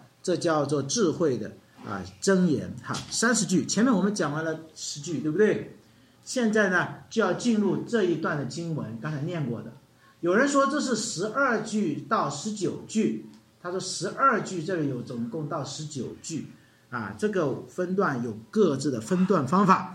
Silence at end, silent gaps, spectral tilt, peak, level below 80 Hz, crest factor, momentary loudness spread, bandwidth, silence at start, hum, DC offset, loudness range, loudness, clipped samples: 0 s; none; -5 dB/octave; -6 dBFS; -70 dBFS; 20 dB; 12 LU; 13.5 kHz; 0.25 s; none; under 0.1%; 4 LU; -27 LUFS; under 0.1%